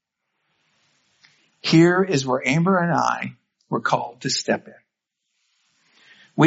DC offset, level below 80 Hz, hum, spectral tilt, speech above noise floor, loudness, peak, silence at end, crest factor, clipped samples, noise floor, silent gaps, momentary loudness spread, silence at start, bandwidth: under 0.1%; -66 dBFS; none; -4.5 dB/octave; 59 dB; -20 LUFS; -2 dBFS; 0 s; 20 dB; under 0.1%; -79 dBFS; none; 13 LU; 1.65 s; 8 kHz